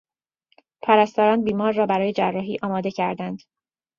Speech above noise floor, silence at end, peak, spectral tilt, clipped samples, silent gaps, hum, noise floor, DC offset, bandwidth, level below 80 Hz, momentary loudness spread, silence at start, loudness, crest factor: 48 dB; 0.6 s; -2 dBFS; -7 dB/octave; under 0.1%; none; none; -69 dBFS; under 0.1%; 7.2 kHz; -64 dBFS; 13 LU; 0.85 s; -21 LUFS; 20 dB